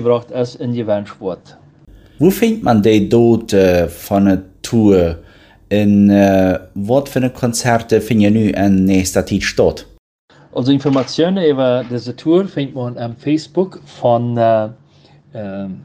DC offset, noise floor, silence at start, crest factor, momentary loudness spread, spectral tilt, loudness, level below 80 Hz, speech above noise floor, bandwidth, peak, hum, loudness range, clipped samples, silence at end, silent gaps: under 0.1%; -47 dBFS; 0 s; 14 dB; 12 LU; -6.5 dB/octave; -15 LUFS; -42 dBFS; 33 dB; 16 kHz; 0 dBFS; none; 4 LU; under 0.1%; 0 s; 9.99-10.28 s